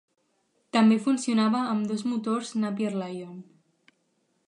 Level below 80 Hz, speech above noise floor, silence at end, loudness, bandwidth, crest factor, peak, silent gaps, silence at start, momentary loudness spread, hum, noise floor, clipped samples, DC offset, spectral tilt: -80 dBFS; 47 dB; 1.05 s; -26 LUFS; 10.5 kHz; 18 dB; -10 dBFS; none; 0.75 s; 15 LU; none; -72 dBFS; under 0.1%; under 0.1%; -5.5 dB/octave